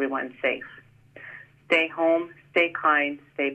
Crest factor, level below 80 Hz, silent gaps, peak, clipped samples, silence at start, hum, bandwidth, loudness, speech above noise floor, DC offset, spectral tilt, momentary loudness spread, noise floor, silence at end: 18 dB; -72 dBFS; none; -8 dBFS; under 0.1%; 0 s; none; 8.6 kHz; -24 LUFS; 21 dB; under 0.1%; -5 dB/octave; 21 LU; -46 dBFS; 0 s